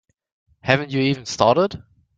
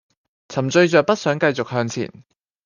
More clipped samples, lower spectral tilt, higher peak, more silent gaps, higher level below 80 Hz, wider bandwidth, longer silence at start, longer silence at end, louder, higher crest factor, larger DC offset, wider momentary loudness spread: neither; about the same, -5.5 dB/octave vs -5.5 dB/octave; about the same, 0 dBFS vs -2 dBFS; neither; first, -54 dBFS vs -64 dBFS; about the same, 9.2 kHz vs 9.8 kHz; first, 0.65 s vs 0.5 s; second, 0.4 s vs 0.6 s; about the same, -20 LUFS vs -19 LUFS; about the same, 20 dB vs 18 dB; neither; about the same, 12 LU vs 14 LU